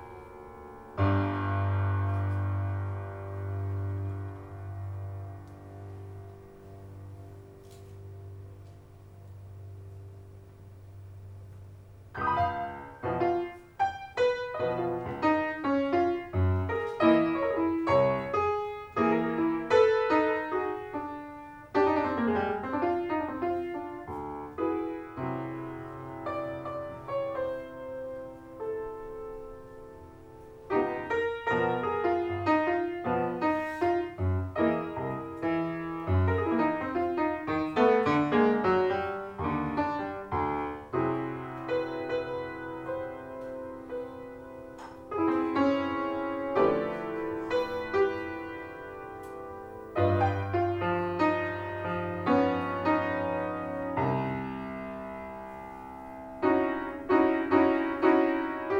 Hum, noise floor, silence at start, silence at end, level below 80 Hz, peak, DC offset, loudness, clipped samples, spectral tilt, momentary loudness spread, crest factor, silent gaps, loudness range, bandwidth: none; -50 dBFS; 0 s; 0 s; -56 dBFS; -10 dBFS; under 0.1%; -30 LUFS; under 0.1%; -8.5 dB/octave; 21 LU; 20 dB; none; 14 LU; 8 kHz